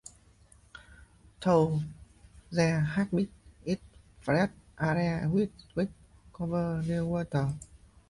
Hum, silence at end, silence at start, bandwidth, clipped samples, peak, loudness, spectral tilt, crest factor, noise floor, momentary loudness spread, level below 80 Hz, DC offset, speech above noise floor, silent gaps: none; 0.45 s; 0.75 s; 11.5 kHz; under 0.1%; -14 dBFS; -31 LUFS; -7.5 dB/octave; 18 dB; -60 dBFS; 13 LU; -54 dBFS; under 0.1%; 31 dB; none